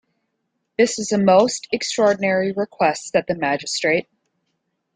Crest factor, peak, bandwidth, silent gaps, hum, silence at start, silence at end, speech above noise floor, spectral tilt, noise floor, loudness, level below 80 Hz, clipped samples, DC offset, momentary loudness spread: 18 dB; -2 dBFS; 9.6 kHz; none; none; 0.8 s; 0.95 s; 55 dB; -4 dB/octave; -74 dBFS; -19 LUFS; -62 dBFS; under 0.1%; under 0.1%; 8 LU